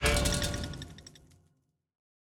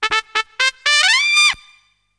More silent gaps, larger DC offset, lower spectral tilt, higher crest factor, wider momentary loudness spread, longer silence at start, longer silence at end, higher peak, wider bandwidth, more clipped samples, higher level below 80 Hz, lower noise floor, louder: neither; neither; first, -3.5 dB/octave vs 3 dB/octave; about the same, 20 dB vs 18 dB; first, 23 LU vs 9 LU; about the same, 0 s vs 0 s; first, 1.1 s vs 0.65 s; second, -14 dBFS vs 0 dBFS; first, 19 kHz vs 10.5 kHz; neither; first, -40 dBFS vs -56 dBFS; first, -74 dBFS vs -54 dBFS; second, -31 LUFS vs -14 LUFS